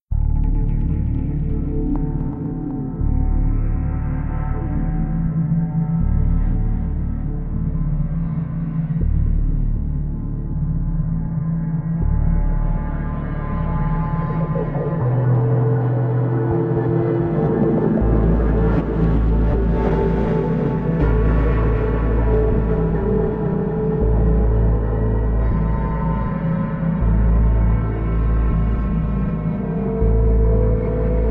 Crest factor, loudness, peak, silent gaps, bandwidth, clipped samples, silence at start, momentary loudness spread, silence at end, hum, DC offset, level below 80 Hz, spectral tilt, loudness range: 14 dB; -20 LUFS; -4 dBFS; none; 3.5 kHz; under 0.1%; 0.1 s; 6 LU; 0 s; none; under 0.1%; -22 dBFS; -12 dB/octave; 4 LU